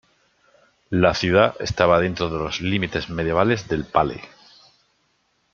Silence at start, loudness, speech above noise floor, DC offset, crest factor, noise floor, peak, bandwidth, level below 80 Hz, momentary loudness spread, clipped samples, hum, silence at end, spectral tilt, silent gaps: 0.9 s; -21 LUFS; 47 dB; under 0.1%; 20 dB; -67 dBFS; -2 dBFS; 7.4 kHz; -46 dBFS; 8 LU; under 0.1%; none; 1.25 s; -5.5 dB/octave; none